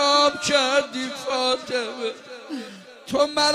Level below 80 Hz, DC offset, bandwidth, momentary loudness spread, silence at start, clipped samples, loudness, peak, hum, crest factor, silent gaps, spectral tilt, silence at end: -62 dBFS; under 0.1%; 15.5 kHz; 16 LU; 0 s; under 0.1%; -22 LUFS; -4 dBFS; none; 18 dB; none; -1.5 dB/octave; 0 s